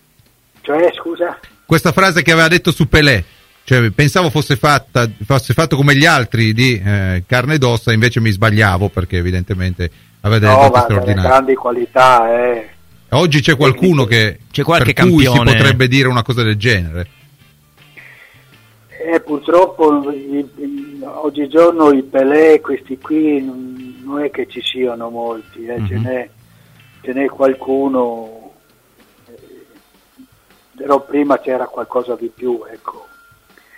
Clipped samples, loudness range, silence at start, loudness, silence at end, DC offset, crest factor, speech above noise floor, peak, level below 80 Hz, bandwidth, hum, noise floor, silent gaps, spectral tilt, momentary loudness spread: under 0.1%; 9 LU; 0.65 s; -13 LUFS; 0.8 s; under 0.1%; 14 dB; 40 dB; 0 dBFS; -36 dBFS; 16.5 kHz; none; -52 dBFS; none; -6 dB/octave; 15 LU